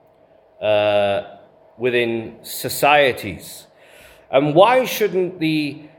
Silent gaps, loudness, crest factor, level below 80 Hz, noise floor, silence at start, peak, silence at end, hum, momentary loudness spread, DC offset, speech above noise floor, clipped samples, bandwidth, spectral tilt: none; -18 LUFS; 20 dB; -62 dBFS; -53 dBFS; 0.6 s; 0 dBFS; 0.1 s; none; 16 LU; under 0.1%; 35 dB; under 0.1%; 18 kHz; -4.5 dB/octave